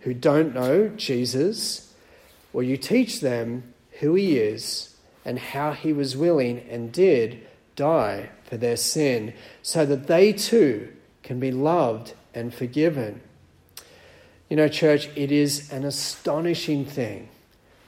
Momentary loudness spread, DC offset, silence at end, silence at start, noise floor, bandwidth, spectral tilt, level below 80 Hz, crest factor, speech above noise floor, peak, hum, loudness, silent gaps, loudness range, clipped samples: 15 LU; under 0.1%; 0.6 s; 0.05 s; -56 dBFS; 16.5 kHz; -5 dB/octave; -62 dBFS; 18 dB; 34 dB; -4 dBFS; none; -23 LUFS; none; 4 LU; under 0.1%